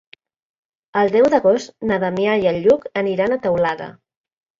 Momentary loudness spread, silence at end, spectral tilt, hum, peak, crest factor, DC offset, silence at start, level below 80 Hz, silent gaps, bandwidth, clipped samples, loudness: 8 LU; 0.65 s; -6.5 dB/octave; none; -2 dBFS; 18 dB; under 0.1%; 0.95 s; -56 dBFS; none; 7.6 kHz; under 0.1%; -18 LUFS